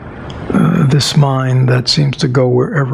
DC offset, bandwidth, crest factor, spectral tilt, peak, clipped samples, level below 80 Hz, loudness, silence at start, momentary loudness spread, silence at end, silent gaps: under 0.1%; 13.5 kHz; 10 dB; -6 dB/octave; -2 dBFS; under 0.1%; -40 dBFS; -12 LUFS; 0 s; 5 LU; 0 s; none